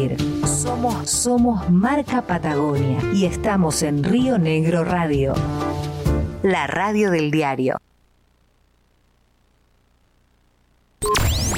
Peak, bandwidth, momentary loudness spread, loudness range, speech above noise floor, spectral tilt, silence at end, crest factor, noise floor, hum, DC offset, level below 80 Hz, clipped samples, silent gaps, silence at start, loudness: -8 dBFS; 16.5 kHz; 5 LU; 8 LU; 41 dB; -5 dB/octave; 0 s; 14 dB; -60 dBFS; 60 Hz at -40 dBFS; under 0.1%; -34 dBFS; under 0.1%; none; 0 s; -20 LUFS